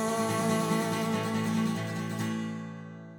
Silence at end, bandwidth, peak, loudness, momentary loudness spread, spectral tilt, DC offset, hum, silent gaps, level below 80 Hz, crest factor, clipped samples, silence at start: 0 s; 19 kHz; -16 dBFS; -30 LUFS; 10 LU; -5.5 dB/octave; under 0.1%; none; none; -72 dBFS; 14 dB; under 0.1%; 0 s